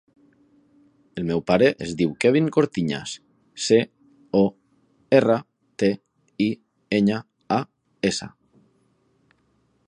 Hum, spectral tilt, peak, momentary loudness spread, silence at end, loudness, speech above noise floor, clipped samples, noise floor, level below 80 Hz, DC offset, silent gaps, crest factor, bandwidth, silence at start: none; -5.5 dB/octave; -2 dBFS; 16 LU; 1.6 s; -23 LUFS; 45 dB; under 0.1%; -66 dBFS; -58 dBFS; under 0.1%; none; 22 dB; 11 kHz; 1.15 s